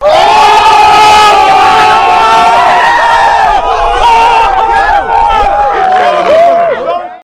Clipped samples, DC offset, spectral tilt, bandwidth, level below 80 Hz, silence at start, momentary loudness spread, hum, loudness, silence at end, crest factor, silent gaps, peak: 2%; under 0.1%; -2.5 dB/octave; 15 kHz; -26 dBFS; 0 s; 5 LU; none; -5 LUFS; 0.05 s; 6 dB; none; 0 dBFS